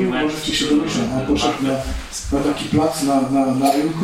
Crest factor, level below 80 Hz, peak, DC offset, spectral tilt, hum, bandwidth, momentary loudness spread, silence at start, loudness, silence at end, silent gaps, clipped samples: 14 dB; -36 dBFS; -4 dBFS; under 0.1%; -5 dB/octave; none; 16.5 kHz; 5 LU; 0 s; -19 LUFS; 0 s; none; under 0.1%